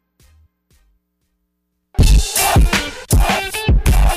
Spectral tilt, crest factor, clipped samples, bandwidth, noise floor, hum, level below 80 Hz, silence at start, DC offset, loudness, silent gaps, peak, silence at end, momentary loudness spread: -4 dB/octave; 12 dB; under 0.1%; 16 kHz; -70 dBFS; none; -18 dBFS; 2 s; under 0.1%; -15 LUFS; none; -4 dBFS; 0 s; 5 LU